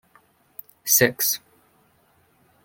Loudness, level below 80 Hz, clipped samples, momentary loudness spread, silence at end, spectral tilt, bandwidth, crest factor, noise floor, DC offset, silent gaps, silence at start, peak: -20 LUFS; -64 dBFS; under 0.1%; 25 LU; 1.25 s; -2 dB/octave; 17 kHz; 24 dB; -62 dBFS; under 0.1%; none; 0.85 s; -2 dBFS